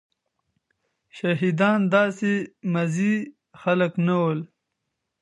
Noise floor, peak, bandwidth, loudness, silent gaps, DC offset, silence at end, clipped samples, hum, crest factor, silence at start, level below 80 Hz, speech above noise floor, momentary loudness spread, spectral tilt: -80 dBFS; -6 dBFS; 11 kHz; -23 LUFS; none; under 0.1%; 0.75 s; under 0.1%; none; 18 dB; 1.15 s; -72 dBFS; 58 dB; 10 LU; -7 dB/octave